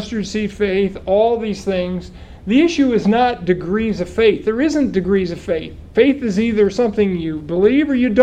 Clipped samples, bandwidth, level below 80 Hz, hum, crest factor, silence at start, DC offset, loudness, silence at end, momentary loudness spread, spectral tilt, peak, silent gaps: under 0.1%; 9.4 kHz; -40 dBFS; none; 16 dB; 0 s; under 0.1%; -17 LUFS; 0 s; 8 LU; -6.5 dB/octave; 0 dBFS; none